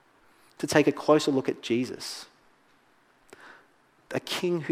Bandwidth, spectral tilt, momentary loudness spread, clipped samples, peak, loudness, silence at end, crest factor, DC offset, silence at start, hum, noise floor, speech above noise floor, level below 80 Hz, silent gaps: 16 kHz; -4.5 dB/octave; 14 LU; under 0.1%; -4 dBFS; -27 LUFS; 0 s; 24 dB; under 0.1%; 0.6 s; none; -63 dBFS; 37 dB; -72 dBFS; none